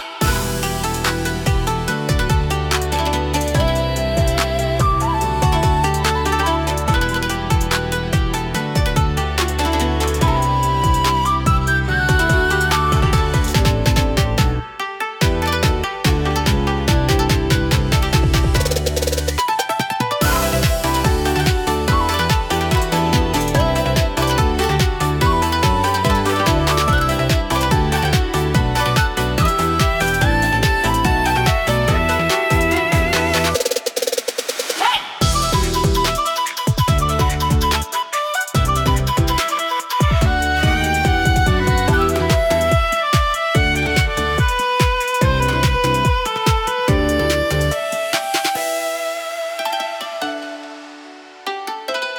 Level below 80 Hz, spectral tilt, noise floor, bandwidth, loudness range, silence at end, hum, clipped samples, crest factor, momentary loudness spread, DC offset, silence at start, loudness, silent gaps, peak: -24 dBFS; -4.5 dB/octave; -38 dBFS; 18 kHz; 3 LU; 0 s; none; under 0.1%; 16 dB; 5 LU; under 0.1%; 0 s; -17 LUFS; none; -2 dBFS